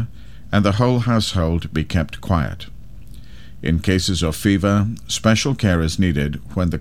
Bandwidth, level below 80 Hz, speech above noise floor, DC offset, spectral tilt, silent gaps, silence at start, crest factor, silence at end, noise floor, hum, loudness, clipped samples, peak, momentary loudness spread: 16 kHz; -34 dBFS; 21 dB; 2%; -5.5 dB/octave; none; 0 s; 18 dB; 0 s; -39 dBFS; none; -19 LUFS; under 0.1%; 0 dBFS; 7 LU